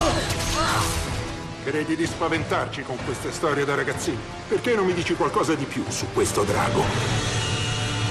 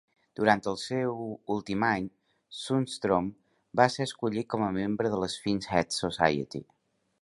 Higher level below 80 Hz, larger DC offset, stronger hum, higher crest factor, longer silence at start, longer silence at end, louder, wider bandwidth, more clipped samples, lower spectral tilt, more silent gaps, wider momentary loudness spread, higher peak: first, -40 dBFS vs -60 dBFS; neither; neither; second, 14 dB vs 24 dB; second, 0 s vs 0.4 s; second, 0 s vs 0.6 s; first, -24 LUFS vs -29 LUFS; first, 13 kHz vs 11.5 kHz; neither; about the same, -4.5 dB/octave vs -5 dB/octave; neither; second, 7 LU vs 12 LU; second, -10 dBFS vs -6 dBFS